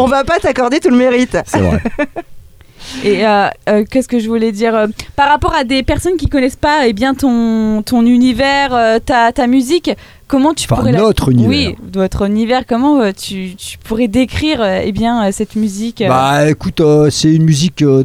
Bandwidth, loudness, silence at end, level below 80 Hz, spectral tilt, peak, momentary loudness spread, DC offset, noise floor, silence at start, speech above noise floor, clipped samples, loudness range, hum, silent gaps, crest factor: 15.5 kHz; -12 LUFS; 0 s; -30 dBFS; -5.5 dB/octave; 0 dBFS; 7 LU; 0.1%; -35 dBFS; 0 s; 23 dB; under 0.1%; 3 LU; none; none; 12 dB